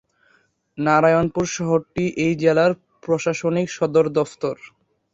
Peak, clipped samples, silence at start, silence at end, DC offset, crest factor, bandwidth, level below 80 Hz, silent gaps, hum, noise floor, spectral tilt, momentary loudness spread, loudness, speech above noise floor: -2 dBFS; under 0.1%; 0.75 s; 0.45 s; under 0.1%; 18 dB; 8 kHz; -54 dBFS; none; none; -61 dBFS; -6 dB/octave; 11 LU; -20 LUFS; 42 dB